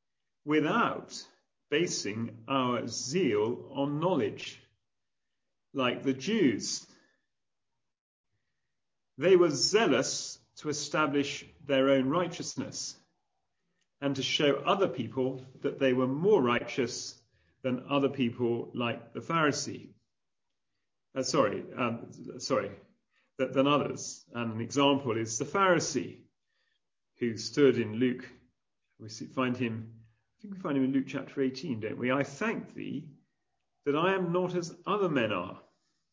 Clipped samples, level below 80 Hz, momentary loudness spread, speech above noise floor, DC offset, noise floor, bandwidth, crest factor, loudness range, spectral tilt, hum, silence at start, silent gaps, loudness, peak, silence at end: under 0.1%; -72 dBFS; 14 LU; 60 dB; under 0.1%; -89 dBFS; 8 kHz; 20 dB; 5 LU; -4.5 dB/octave; none; 0.45 s; 8.00-8.24 s; -30 LUFS; -10 dBFS; 0.5 s